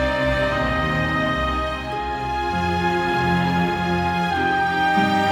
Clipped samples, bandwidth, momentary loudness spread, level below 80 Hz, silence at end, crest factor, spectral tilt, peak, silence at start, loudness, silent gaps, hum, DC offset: under 0.1%; 16.5 kHz; 6 LU; -34 dBFS; 0 s; 12 dB; -6 dB/octave; -8 dBFS; 0 s; -21 LUFS; none; none; under 0.1%